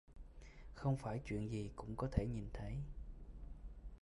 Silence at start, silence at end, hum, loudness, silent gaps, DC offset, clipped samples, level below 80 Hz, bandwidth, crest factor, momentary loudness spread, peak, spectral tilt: 0.1 s; 0.05 s; none; -44 LUFS; none; under 0.1%; under 0.1%; -50 dBFS; 11.5 kHz; 24 dB; 19 LU; -20 dBFS; -8 dB/octave